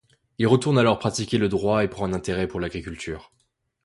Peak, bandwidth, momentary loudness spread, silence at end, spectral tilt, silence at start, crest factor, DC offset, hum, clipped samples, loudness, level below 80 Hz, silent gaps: -4 dBFS; 11.5 kHz; 14 LU; 0.65 s; -6 dB/octave; 0.4 s; 20 dB; under 0.1%; none; under 0.1%; -23 LUFS; -46 dBFS; none